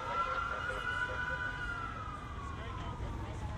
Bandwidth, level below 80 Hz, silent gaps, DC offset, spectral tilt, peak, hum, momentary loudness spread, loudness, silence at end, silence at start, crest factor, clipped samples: 13 kHz; -46 dBFS; none; under 0.1%; -5 dB/octave; -24 dBFS; none; 8 LU; -38 LUFS; 0 s; 0 s; 14 dB; under 0.1%